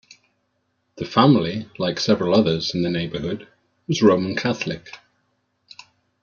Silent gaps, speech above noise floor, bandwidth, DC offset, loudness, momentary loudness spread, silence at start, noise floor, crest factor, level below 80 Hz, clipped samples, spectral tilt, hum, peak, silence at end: none; 51 dB; 7.2 kHz; under 0.1%; -20 LUFS; 17 LU; 0.95 s; -71 dBFS; 20 dB; -56 dBFS; under 0.1%; -6 dB/octave; none; -2 dBFS; 1.25 s